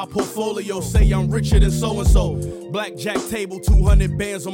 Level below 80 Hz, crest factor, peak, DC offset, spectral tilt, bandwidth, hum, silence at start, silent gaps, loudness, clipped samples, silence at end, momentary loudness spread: -20 dBFS; 12 dB; -4 dBFS; under 0.1%; -6 dB/octave; 16.5 kHz; none; 0 s; none; -20 LUFS; under 0.1%; 0 s; 9 LU